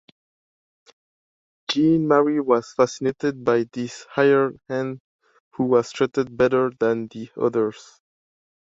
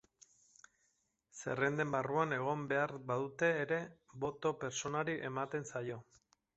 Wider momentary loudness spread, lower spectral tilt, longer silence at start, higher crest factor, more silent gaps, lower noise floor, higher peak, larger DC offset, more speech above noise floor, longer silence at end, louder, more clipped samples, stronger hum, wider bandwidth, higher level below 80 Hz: about the same, 11 LU vs 9 LU; first, -6 dB/octave vs -4.5 dB/octave; first, 1.7 s vs 1.35 s; about the same, 20 dB vs 20 dB; first, 5.00-5.19 s, 5.40-5.51 s vs none; first, under -90 dBFS vs -80 dBFS; first, -4 dBFS vs -18 dBFS; neither; first, over 69 dB vs 43 dB; first, 0.95 s vs 0.55 s; first, -22 LUFS vs -38 LUFS; neither; neither; about the same, 8 kHz vs 8 kHz; first, -62 dBFS vs -74 dBFS